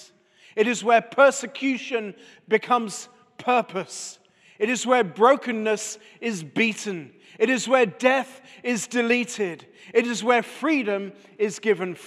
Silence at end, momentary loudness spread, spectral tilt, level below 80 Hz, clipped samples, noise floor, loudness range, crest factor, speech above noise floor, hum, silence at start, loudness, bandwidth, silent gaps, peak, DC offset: 0 s; 15 LU; -3.5 dB/octave; -84 dBFS; under 0.1%; -54 dBFS; 2 LU; 20 dB; 31 dB; none; 0 s; -23 LUFS; 13.5 kHz; none; -4 dBFS; under 0.1%